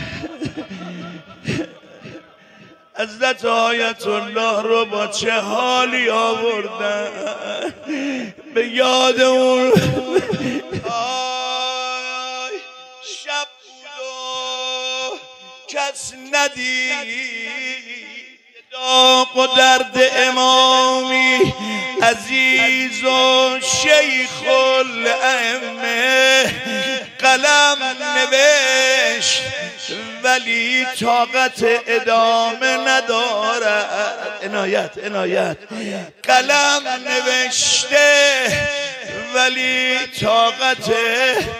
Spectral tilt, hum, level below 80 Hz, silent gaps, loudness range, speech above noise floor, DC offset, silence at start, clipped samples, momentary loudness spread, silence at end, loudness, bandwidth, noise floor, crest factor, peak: -2 dB/octave; none; -56 dBFS; none; 10 LU; 29 dB; under 0.1%; 0 s; under 0.1%; 15 LU; 0 s; -16 LUFS; 15.5 kHz; -46 dBFS; 18 dB; 0 dBFS